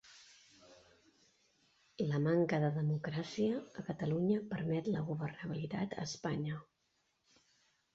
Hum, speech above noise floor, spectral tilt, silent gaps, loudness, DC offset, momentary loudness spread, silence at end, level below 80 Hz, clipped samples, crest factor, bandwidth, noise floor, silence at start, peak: none; 44 dB; -7 dB/octave; none; -37 LUFS; under 0.1%; 10 LU; 1.3 s; -72 dBFS; under 0.1%; 18 dB; 7.8 kHz; -80 dBFS; 0.05 s; -22 dBFS